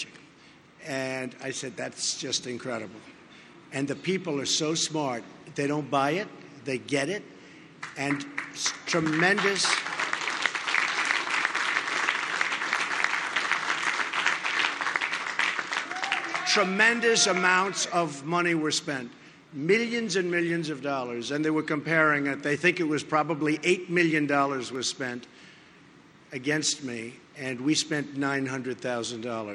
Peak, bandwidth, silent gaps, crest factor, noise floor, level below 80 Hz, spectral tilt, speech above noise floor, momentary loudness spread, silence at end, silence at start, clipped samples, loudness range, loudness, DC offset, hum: -6 dBFS; 11.5 kHz; none; 22 dB; -54 dBFS; -74 dBFS; -3 dB/octave; 27 dB; 11 LU; 0 s; 0 s; under 0.1%; 7 LU; -27 LUFS; under 0.1%; none